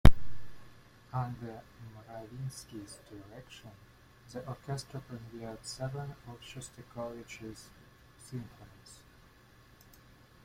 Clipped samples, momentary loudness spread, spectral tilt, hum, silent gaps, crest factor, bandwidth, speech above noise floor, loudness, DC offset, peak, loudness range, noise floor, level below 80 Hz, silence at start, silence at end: under 0.1%; 20 LU; -6 dB/octave; none; none; 28 dB; 15.5 kHz; 16 dB; -42 LUFS; under 0.1%; -4 dBFS; 5 LU; -60 dBFS; -40 dBFS; 0.05 s; 2 s